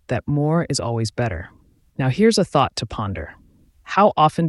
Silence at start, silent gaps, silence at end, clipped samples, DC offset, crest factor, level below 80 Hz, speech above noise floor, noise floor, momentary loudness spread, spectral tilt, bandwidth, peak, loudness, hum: 0.1 s; none; 0 s; under 0.1%; under 0.1%; 18 dB; -44 dBFS; 28 dB; -47 dBFS; 17 LU; -5.5 dB/octave; 12 kHz; -4 dBFS; -20 LUFS; none